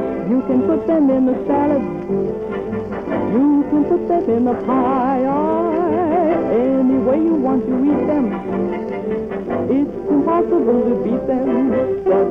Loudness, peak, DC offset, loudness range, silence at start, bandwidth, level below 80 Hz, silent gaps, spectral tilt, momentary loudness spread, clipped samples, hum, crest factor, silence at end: -17 LUFS; -6 dBFS; under 0.1%; 2 LU; 0 s; 5 kHz; -46 dBFS; none; -10 dB/octave; 7 LU; under 0.1%; none; 12 dB; 0 s